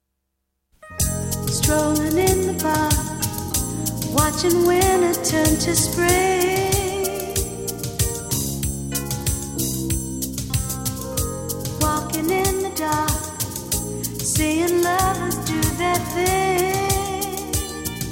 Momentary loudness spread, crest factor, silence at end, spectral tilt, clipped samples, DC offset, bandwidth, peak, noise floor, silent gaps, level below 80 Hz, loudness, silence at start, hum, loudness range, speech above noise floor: 8 LU; 18 dB; 0 s; -4 dB/octave; under 0.1%; under 0.1%; 17 kHz; -4 dBFS; -76 dBFS; none; -34 dBFS; -21 LUFS; 0.85 s; none; 6 LU; 58 dB